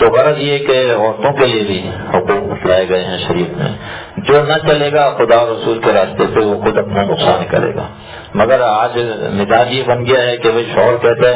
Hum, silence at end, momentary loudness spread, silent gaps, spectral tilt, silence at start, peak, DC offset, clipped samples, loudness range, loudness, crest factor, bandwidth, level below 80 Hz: none; 0 s; 8 LU; none; -9.5 dB/octave; 0 s; 0 dBFS; under 0.1%; 0.2%; 2 LU; -13 LUFS; 12 dB; 4 kHz; -40 dBFS